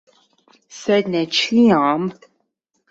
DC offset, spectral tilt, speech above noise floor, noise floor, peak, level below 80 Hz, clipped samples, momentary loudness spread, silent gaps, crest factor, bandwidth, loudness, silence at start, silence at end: under 0.1%; -5 dB/octave; 54 dB; -71 dBFS; -4 dBFS; -62 dBFS; under 0.1%; 12 LU; none; 16 dB; 7.8 kHz; -17 LUFS; 0.75 s; 0.8 s